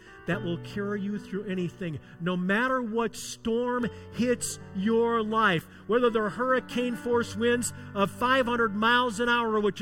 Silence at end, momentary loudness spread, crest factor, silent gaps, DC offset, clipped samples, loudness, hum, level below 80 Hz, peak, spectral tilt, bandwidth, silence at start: 0 s; 9 LU; 16 dB; none; under 0.1%; under 0.1%; -27 LUFS; none; -58 dBFS; -12 dBFS; -4.5 dB/octave; 16.5 kHz; 0.05 s